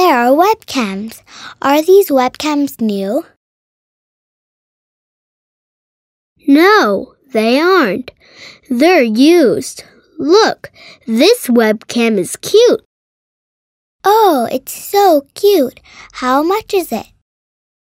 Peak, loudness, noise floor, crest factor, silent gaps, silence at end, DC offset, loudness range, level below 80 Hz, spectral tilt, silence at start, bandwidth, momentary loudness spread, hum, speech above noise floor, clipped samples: 0 dBFS; -12 LUFS; under -90 dBFS; 14 dB; 3.36-6.36 s, 12.85-13.99 s; 0.8 s; under 0.1%; 5 LU; -58 dBFS; -4 dB/octave; 0 s; 16.5 kHz; 13 LU; none; over 78 dB; under 0.1%